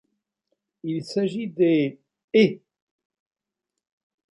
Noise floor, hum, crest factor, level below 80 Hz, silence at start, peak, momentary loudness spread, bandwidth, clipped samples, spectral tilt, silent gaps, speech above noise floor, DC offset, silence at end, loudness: -85 dBFS; none; 20 dB; -72 dBFS; 0.85 s; -6 dBFS; 12 LU; 11 kHz; under 0.1%; -7 dB/octave; 2.24-2.28 s; 64 dB; under 0.1%; 1.75 s; -23 LUFS